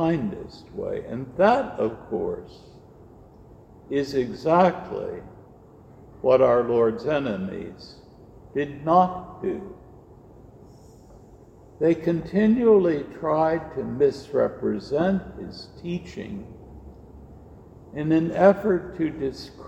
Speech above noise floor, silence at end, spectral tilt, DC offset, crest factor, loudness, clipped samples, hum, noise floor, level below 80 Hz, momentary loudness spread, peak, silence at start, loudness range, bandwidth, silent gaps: 26 dB; 0 s; -8 dB/octave; under 0.1%; 22 dB; -23 LUFS; under 0.1%; none; -49 dBFS; -52 dBFS; 19 LU; -2 dBFS; 0 s; 6 LU; 8.8 kHz; none